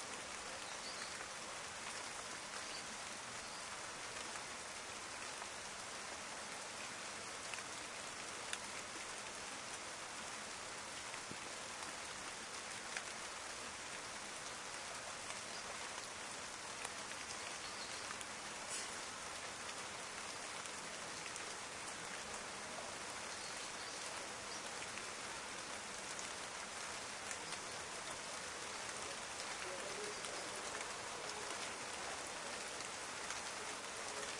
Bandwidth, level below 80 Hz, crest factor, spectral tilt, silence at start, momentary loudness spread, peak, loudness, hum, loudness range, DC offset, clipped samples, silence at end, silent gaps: 11.5 kHz; -74 dBFS; 24 dB; -0.5 dB/octave; 0 s; 2 LU; -22 dBFS; -45 LUFS; none; 2 LU; under 0.1%; under 0.1%; 0 s; none